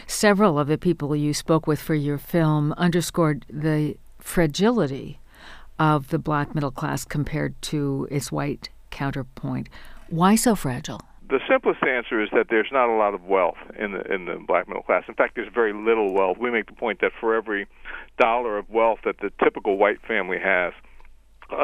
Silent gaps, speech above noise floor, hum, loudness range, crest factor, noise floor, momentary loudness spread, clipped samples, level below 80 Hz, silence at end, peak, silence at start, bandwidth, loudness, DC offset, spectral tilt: none; 24 dB; none; 4 LU; 20 dB; -46 dBFS; 10 LU; under 0.1%; -46 dBFS; 0 s; -4 dBFS; 0 s; 15.5 kHz; -23 LUFS; under 0.1%; -5.5 dB/octave